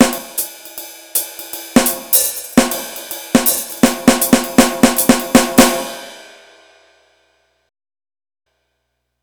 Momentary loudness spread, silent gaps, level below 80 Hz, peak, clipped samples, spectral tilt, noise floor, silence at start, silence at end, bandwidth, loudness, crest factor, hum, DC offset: 16 LU; none; -40 dBFS; 0 dBFS; under 0.1%; -3 dB/octave; -71 dBFS; 0 s; 3 s; over 20 kHz; -14 LUFS; 16 dB; 60 Hz at -35 dBFS; under 0.1%